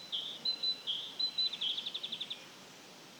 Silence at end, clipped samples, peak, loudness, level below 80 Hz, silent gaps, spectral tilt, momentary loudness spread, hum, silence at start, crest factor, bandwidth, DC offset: 0 s; under 0.1%; -24 dBFS; -35 LUFS; under -90 dBFS; none; -0.5 dB/octave; 19 LU; none; 0 s; 16 dB; over 20 kHz; under 0.1%